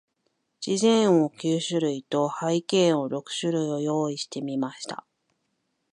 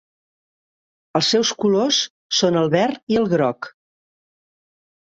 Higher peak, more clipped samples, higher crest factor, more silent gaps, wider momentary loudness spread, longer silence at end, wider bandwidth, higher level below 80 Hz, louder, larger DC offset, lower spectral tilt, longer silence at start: second, -10 dBFS vs -4 dBFS; neither; about the same, 16 dB vs 18 dB; second, none vs 2.10-2.29 s, 3.03-3.07 s; first, 11 LU vs 7 LU; second, 0.95 s vs 1.35 s; first, 11 kHz vs 8.2 kHz; second, -78 dBFS vs -62 dBFS; second, -25 LUFS vs -19 LUFS; neither; about the same, -5 dB/octave vs -4 dB/octave; second, 0.6 s vs 1.15 s